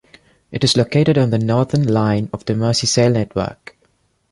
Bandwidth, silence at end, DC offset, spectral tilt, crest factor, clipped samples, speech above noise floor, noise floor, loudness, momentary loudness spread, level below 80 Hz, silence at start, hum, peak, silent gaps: 11.5 kHz; 0.8 s; under 0.1%; -5.5 dB/octave; 16 dB; under 0.1%; 45 dB; -61 dBFS; -17 LUFS; 8 LU; -46 dBFS; 0.5 s; none; -2 dBFS; none